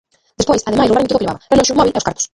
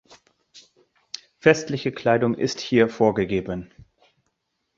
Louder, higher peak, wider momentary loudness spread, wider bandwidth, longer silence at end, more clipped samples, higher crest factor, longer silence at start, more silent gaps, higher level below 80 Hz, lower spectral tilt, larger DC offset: first, -14 LUFS vs -22 LUFS; about the same, 0 dBFS vs -2 dBFS; second, 6 LU vs 16 LU; first, 11.5 kHz vs 7.8 kHz; second, 0.1 s vs 1.1 s; neither; second, 14 dB vs 22 dB; second, 0.4 s vs 0.55 s; neither; first, -38 dBFS vs -54 dBFS; second, -4 dB/octave vs -5.5 dB/octave; neither